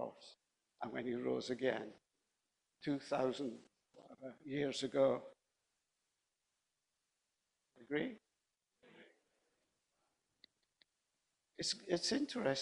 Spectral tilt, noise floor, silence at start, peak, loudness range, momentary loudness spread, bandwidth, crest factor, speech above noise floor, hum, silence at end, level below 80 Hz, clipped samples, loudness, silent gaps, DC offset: -4 dB/octave; -89 dBFS; 0 s; -20 dBFS; 10 LU; 19 LU; 10.5 kHz; 22 dB; 49 dB; none; 0 s; -80 dBFS; under 0.1%; -40 LUFS; none; under 0.1%